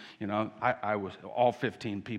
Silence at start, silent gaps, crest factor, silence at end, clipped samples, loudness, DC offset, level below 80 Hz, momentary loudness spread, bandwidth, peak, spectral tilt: 0 s; none; 20 dB; 0 s; under 0.1%; -32 LUFS; under 0.1%; -72 dBFS; 7 LU; 10.5 kHz; -12 dBFS; -7 dB/octave